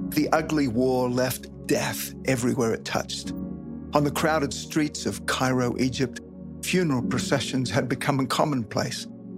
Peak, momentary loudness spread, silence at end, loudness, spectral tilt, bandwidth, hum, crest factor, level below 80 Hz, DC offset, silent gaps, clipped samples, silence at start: -4 dBFS; 8 LU; 0 s; -26 LUFS; -5 dB/octave; 16 kHz; none; 22 dB; -50 dBFS; under 0.1%; none; under 0.1%; 0 s